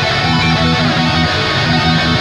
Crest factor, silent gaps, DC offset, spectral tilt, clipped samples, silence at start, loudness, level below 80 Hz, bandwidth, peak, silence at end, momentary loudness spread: 12 dB; none; under 0.1%; -5 dB/octave; under 0.1%; 0 s; -12 LUFS; -30 dBFS; 10.5 kHz; 0 dBFS; 0 s; 1 LU